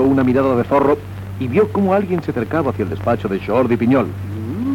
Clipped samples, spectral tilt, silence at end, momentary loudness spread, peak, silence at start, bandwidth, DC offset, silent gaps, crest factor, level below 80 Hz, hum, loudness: under 0.1%; -9 dB/octave; 0 s; 9 LU; -4 dBFS; 0 s; 16.5 kHz; under 0.1%; none; 12 dB; -44 dBFS; none; -17 LUFS